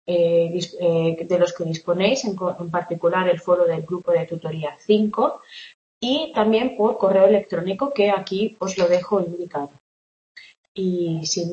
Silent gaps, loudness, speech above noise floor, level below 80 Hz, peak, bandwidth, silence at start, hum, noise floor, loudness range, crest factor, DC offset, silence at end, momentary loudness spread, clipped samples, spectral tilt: 5.74-6.01 s, 9.80-10.35 s, 10.58-10.75 s; -21 LUFS; over 69 dB; -64 dBFS; -4 dBFS; 8 kHz; 0.1 s; none; under -90 dBFS; 4 LU; 18 dB; under 0.1%; 0 s; 10 LU; under 0.1%; -5.5 dB/octave